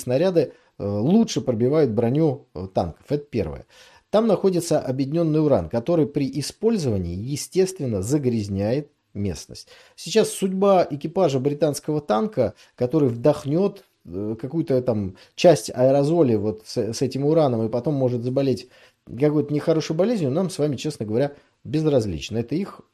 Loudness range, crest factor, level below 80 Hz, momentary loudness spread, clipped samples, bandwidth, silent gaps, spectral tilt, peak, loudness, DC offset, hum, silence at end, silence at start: 3 LU; 18 dB; -54 dBFS; 10 LU; under 0.1%; 13.5 kHz; none; -6.5 dB/octave; -4 dBFS; -22 LUFS; under 0.1%; none; 0.15 s; 0 s